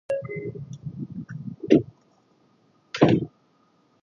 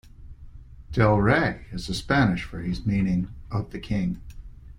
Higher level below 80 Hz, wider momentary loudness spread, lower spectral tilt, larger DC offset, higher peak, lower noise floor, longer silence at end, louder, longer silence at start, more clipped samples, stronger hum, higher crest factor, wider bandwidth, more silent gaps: second, -58 dBFS vs -40 dBFS; first, 17 LU vs 11 LU; about the same, -7.5 dB/octave vs -7 dB/octave; neither; about the same, -2 dBFS vs -4 dBFS; first, -63 dBFS vs -43 dBFS; first, 0.75 s vs 0 s; about the same, -25 LUFS vs -25 LUFS; about the same, 0.1 s vs 0.05 s; neither; neither; first, 26 dB vs 20 dB; second, 7.2 kHz vs 11 kHz; neither